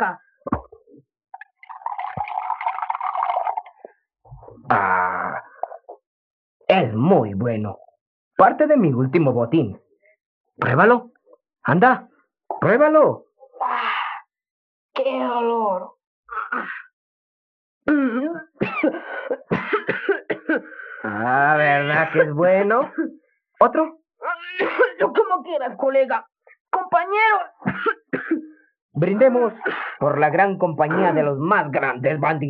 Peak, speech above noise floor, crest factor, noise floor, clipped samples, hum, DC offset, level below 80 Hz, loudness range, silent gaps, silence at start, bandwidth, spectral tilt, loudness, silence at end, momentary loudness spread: -2 dBFS; 33 dB; 20 dB; -52 dBFS; under 0.1%; none; under 0.1%; -60 dBFS; 7 LU; 6.06-6.60 s, 8.01-8.31 s, 10.25-10.44 s, 14.50-14.89 s, 16.07-16.23 s, 16.93-17.81 s, 26.60-26.65 s, 28.82-28.89 s; 0 s; 5.4 kHz; -9.5 dB/octave; -20 LUFS; 0 s; 13 LU